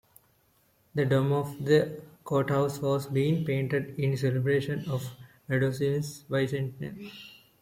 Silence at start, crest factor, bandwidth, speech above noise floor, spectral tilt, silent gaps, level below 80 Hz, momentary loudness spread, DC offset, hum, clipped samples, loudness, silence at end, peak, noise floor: 0.95 s; 18 dB; 16 kHz; 39 dB; -7 dB/octave; none; -64 dBFS; 16 LU; under 0.1%; none; under 0.1%; -28 LUFS; 0.3 s; -10 dBFS; -67 dBFS